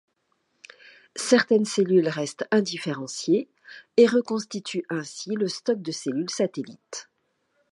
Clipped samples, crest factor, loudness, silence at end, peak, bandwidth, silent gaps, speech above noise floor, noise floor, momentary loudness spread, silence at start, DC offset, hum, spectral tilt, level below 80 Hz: under 0.1%; 22 dB; -24 LUFS; 0.7 s; -4 dBFS; 11.5 kHz; none; 48 dB; -73 dBFS; 17 LU; 1.15 s; under 0.1%; none; -4.5 dB/octave; -78 dBFS